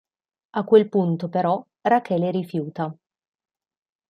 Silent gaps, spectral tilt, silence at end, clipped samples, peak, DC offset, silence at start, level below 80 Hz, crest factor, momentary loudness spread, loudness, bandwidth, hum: none; -9 dB/octave; 1.15 s; under 0.1%; -4 dBFS; under 0.1%; 0.55 s; -72 dBFS; 20 dB; 13 LU; -22 LUFS; 6.4 kHz; none